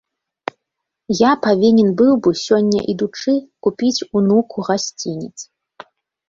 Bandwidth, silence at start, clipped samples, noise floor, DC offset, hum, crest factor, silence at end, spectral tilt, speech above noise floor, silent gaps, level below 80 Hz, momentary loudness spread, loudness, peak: 7.6 kHz; 1.1 s; under 0.1%; -79 dBFS; under 0.1%; none; 16 dB; 0.85 s; -5.5 dB/octave; 64 dB; none; -58 dBFS; 18 LU; -16 LUFS; 0 dBFS